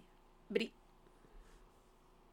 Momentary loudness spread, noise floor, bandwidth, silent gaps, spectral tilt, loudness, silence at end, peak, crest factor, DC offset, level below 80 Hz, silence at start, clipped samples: 26 LU; -66 dBFS; 17.5 kHz; none; -5 dB/octave; -41 LUFS; 0.75 s; -22 dBFS; 26 dB; under 0.1%; -66 dBFS; 0.5 s; under 0.1%